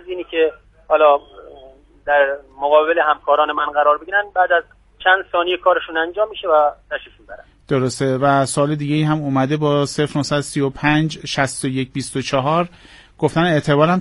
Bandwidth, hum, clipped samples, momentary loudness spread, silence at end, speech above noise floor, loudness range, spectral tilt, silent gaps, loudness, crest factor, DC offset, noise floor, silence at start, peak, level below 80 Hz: 11.5 kHz; none; under 0.1%; 7 LU; 0 s; 27 dB; 3 LU; -5.5 dB/octave; none; -18 LUFS; 18 dB; under 0.1%; -44 dBFS; 0.05 s; 0 dBFS; -50 dBFS